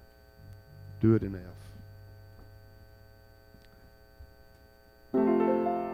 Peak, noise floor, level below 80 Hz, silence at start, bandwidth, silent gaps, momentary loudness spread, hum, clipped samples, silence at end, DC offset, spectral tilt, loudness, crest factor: -12 dBFS; -57 dBFS; -56 dBFS; 0.45 s; 15.5 kHz; none; 27 LU; 60 Hz at -65 dBFS; under 0.1%; 0 s; under 0.1%; -10 dB/octave; -28 LUFS; 20 dB